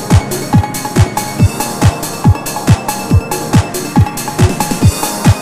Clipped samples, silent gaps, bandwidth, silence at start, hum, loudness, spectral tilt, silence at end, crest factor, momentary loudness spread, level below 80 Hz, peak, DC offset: 0.4%; none; 16 kHz; 0 s; none; -13 LUFS; -5.5 dB/octave; 0 s; 12 dB; 2 LU; -24 dBFS; 0 dBFS; under 0.1%